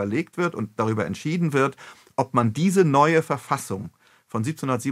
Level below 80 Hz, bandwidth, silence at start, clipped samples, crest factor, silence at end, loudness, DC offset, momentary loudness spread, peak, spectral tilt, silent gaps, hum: -66 dBFS; 16 kHz; 0 s; under 0.1%; 18 dB; 0 s; -23 LUFS; under 0.1%; 12 LU; -4 dBFS; -6.5 dB/octave; none; none